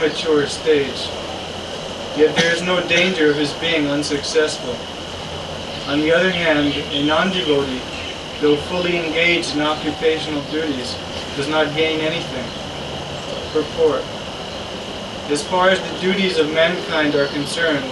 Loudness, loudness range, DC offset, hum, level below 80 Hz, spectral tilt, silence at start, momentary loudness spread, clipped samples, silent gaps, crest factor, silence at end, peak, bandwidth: -19 LUFS; 4 LU; under 0.1%; none; -46 dBFS; -4 dB/octave; 0 s; 12 LU; under 0.1%; none; 16 dB; 0 s; -2 dBFS; 12 kHz